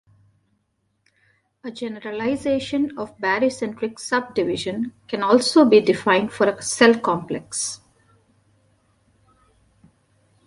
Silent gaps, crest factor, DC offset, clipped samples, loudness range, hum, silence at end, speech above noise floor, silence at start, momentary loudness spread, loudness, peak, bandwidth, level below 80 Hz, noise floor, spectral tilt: none; 20 dB; under 0.1%; under 0.1%; 10 LU; none; 2.7 s; 50 dB; 1.65 s; 14 LU; -21 LUFS; -2 dBFS; 11.5 kHz; -60 dBFS; -70 dBFS; -4 dB/octave